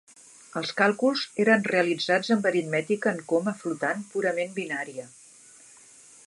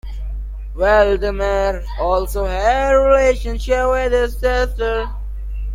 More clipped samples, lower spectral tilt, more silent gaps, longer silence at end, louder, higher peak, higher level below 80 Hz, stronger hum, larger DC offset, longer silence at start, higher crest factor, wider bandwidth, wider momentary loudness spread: neither; about the same, -4.5 dB/octave vs -5.5 dB/octave; neither; first, 1.2 s vs 0 s; second, -26 LUFS vs -17 LUFS; second, -6 dBFS vs -2 dBFS; second, -78 dBFS vs -24 dBFS; neither; neither; first, 0.5 s vs 0.05 s; about the same, 20 dB vs 16 dB; second, 11.5 kHz vs 16 kHz; second, 11 LU vs 16 LU